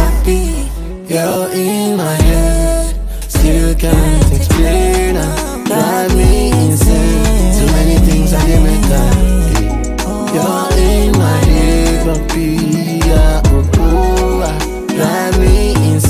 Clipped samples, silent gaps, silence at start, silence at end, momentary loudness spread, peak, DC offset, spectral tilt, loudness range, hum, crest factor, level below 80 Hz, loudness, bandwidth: under 0.1%; none; 0 s; 0 s; 6 LU; 0 dBFS; under 0.1%; -5.5 dB/octave; 2 LU; none; 10 dB; -14 dBFS; -13 LUFS; 16 kHz